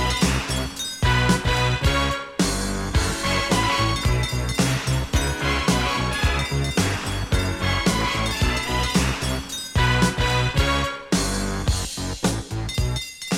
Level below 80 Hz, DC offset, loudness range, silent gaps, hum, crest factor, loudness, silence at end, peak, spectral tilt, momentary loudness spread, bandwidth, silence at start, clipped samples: -30 dBFS; under 0.1%; 1 LU; none; none; 18 dB; -22 LUFS; 0 s; -4 dBFS; -4 dB/octave; 6 LU; 16.5 kHz; 0 s; under 0.1%